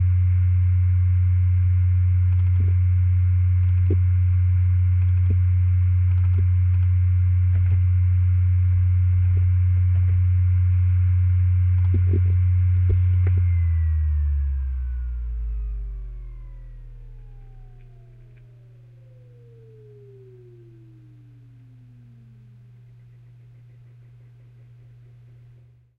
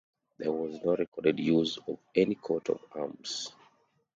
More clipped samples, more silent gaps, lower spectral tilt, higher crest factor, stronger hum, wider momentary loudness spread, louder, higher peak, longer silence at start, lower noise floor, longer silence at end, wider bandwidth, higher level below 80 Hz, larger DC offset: neither; second, none vs 1.08-1.12 s; first, -11.5 dB/octave vs -5 dB/octave; second, 10 dB vs 20 dB; neither; about the same, 9 LU vs 10 LU; first, -20 LUFS vs -31 LUFS; about the same, -10 dBFS vs -12 dBFS; second, 0 s vs 0.4 s; second, -51 dBFS vs -68 dBFS; first, 8.15 s vs 0.65 s; second, 2.7 kHz vs 8.8 kHz; first, -32 dBFS vs -68 dBFS; neither